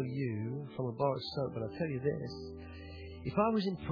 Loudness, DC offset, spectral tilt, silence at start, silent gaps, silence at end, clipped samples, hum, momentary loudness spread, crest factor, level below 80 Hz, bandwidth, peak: -36 LUFS; under 0.1%; -6 dB/octave; 0 s; none; 0 s; under 0.1%; none; 16 LU; 18 dB; -58 dBFS; 5.4 kHz; -18 dBFS